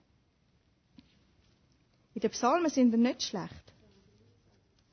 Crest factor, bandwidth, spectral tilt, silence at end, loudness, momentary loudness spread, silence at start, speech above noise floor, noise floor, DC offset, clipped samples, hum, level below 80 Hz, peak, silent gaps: 18 dB; 6.6 kHz; -4.5 dB/octave; 1.35 s; -29 LUFS; 16 LU; 2.15 s; 42 dB; -70 dBFS; under 0.1%; under 0.1%; none; -68 dBFS; -14 dBFS; none